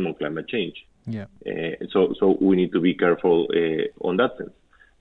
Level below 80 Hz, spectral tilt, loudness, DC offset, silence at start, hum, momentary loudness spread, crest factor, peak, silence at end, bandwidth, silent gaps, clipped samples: -60 dBFS; -9 dB/octave; -22 LUFS; under 0.1%; 0 s; none; 14 LU; 16 dB; -6 dBFS; 0.5 s; 4.3 kHz; none; under 0.1%